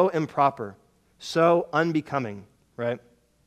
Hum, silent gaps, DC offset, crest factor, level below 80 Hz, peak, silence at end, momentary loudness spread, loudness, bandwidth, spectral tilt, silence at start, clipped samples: none; none; under 0.1%; 20 dB; -68 dBFS; -6 dBFS; 0.5 s; 17 LU; -25 LUFS; 13.5 kHz; -6.5 dB/octave; 0 s; under 0.1%